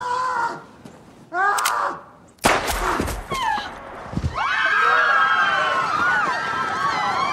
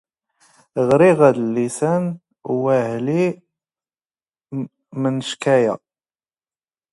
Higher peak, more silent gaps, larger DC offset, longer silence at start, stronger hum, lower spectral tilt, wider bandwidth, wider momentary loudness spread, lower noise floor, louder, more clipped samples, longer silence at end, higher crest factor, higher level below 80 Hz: about the same, -4 dBFS vs -2 dBFS; neither; neither; second, 0 s vs 0.75 s; neither; second, -3 dB/octave vs -6.5 dB/octave; first, 16 kHz vs 11.5 kHz; second, 12 LU vs 17 LU; second, -44 dBFS vs under -90 dBFS; about the same, -20 LUFS vs -18 LUFS; neither; second, 0 s vs 1.15 s; about the same, 18 dB vs 18 dB; first, -40 dBFS vs -64 dBFS